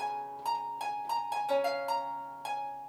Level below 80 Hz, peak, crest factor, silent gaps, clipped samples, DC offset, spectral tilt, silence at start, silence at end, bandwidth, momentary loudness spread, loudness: -78 dBFS; -18 dBFS; 16 dB; none; under 0.1%; under 0.1%; -2.5 dB/octave; 0 s; 0 s; 19.5 kHz; 7 LU; -34 LUFS